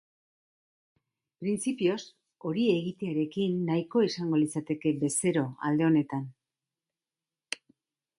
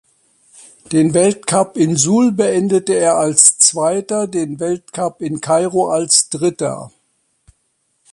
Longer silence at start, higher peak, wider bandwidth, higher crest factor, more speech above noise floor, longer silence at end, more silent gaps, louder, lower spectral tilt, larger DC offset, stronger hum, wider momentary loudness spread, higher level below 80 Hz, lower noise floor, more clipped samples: first, 1.4 s vs 0.9 s; second, -12 dBFS vs 0 dBFS; about the same, 11.5 kHz vs 12 kHz; about the same, 18 dB vs 16 dB; first, over 62 dB vs 50 dB; second, 0.65 s vs 1.25 s; neither; second, -29 LUFS vs -14 LUFS; first, -5.5 dB/octave vs -3.5 dB/octave; neither; neither; about the same, 13 LU vs 12 LU; second, -74 dBFS vs -58 dBFS; first, under -90 dBFS vs -65 dBFS; neither